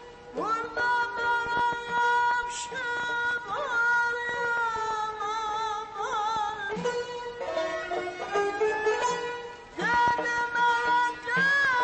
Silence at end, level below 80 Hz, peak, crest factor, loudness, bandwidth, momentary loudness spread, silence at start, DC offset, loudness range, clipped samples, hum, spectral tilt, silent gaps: 0 s; -60 dBFS; -14 dBFS; 14 dB; -27 LUFS; 8.8 kHz; 9 LU; 0 s; under 0.1%; 4 LU; under 0.1%; none; -2.5 dB/octave; none